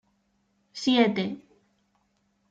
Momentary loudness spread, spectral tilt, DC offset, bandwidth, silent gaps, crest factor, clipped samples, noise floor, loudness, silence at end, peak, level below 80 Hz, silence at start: 21 LU; -5 dB/octave; under 0.1%; 7.8 kHz; none; 22 dB; under 0.1%; -71 dBFS; -25 LUFS; 1.15 s; -8 dBFS; -74 dBFS; 0.75 s